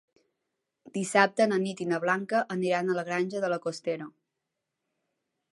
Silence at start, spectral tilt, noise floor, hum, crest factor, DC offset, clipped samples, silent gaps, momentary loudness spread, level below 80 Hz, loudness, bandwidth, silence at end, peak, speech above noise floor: 0.85 s; -5 dB/octave; -85 dBFS; none; 24 dB; under 0.1%; under 0.1%; none; 11 LU; -82 dBFS; -28 LUFS; 11.5 kHz; 1.45 s; -6 dBFS; 57 dB